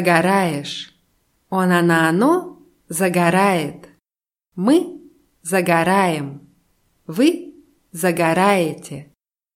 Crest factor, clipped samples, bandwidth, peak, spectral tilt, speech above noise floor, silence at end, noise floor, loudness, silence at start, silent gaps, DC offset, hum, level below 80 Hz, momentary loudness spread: 18 dB; under 0.1%; 16.5 kHz; 0 dBFS; -5.5 dB/octave; over 73 dB; 0.5 s; under -90 dBFS; -18 LUFS; 0 s; none; under 0.1%; none; -62 dBFS; 17 LU